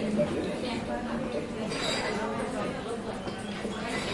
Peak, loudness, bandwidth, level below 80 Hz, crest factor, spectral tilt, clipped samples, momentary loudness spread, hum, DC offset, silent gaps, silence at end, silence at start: -14 dBFS; -32 LUFS; 11.5 kHz; -52 dBFS; 16 dB; -4.5 dB/octave; under 0.1%; 6 LU; none; under 0.1%; none; 0 s; 0 s